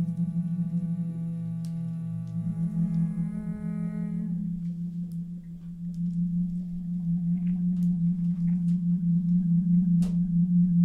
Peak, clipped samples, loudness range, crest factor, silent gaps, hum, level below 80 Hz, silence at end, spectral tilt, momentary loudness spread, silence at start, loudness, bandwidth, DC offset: -16 dBFS; under 0.1%; 7 LU; 12 dB; none; none; -50 dBFS; 0 s; -11 dB/octave; 10 LU; 0 s; -28 LUFS; 2.2 kHz; under 0.1%